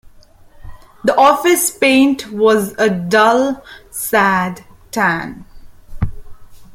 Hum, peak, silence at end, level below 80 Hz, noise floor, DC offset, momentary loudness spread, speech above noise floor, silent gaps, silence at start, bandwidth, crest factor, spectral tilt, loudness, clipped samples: none; 0 dBFS; 0.1 s; -38 dBFS; -43 dBFS; under 0.1%; 14 LU; 29 dB; none; 0.6 s; 16.5 kHz; 16 dB; -4 dB/octave; -14 LUFS; under 0.1%